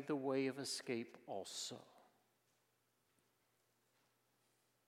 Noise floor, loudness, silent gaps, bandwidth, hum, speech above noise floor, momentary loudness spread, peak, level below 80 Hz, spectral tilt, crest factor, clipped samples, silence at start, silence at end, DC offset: -82 dBFS; -44 LUFS; none; 16 kHz; none; 38 dB; 10 LU; -28 dBFS; under -90 dBFS; -3.5 dB/octave; 20 dB; under 0.1%; 0 s; 2.85 s; under 0.1%